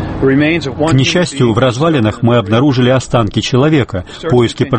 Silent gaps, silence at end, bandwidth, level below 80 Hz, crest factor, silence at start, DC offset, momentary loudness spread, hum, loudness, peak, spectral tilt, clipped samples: none; 0 s; 8.8 kHz; -34 dBFS; 12 dB; 0 s; under 0.1%; 4 LU; none; -12 LUFS; 0 dBFS; -6 dB/octave; under 0.1%